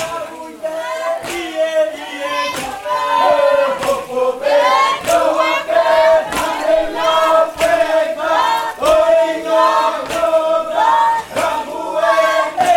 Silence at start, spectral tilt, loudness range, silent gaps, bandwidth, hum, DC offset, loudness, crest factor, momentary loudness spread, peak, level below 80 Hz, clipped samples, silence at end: 0 s; -2.5 dB/octave; 3 LU; none; 17 kHz; none; under 0.1%; -15 LUFS; 14 dB; 9 LU; 0 dBFS; -46 dBFS; under 0.1%; 0 s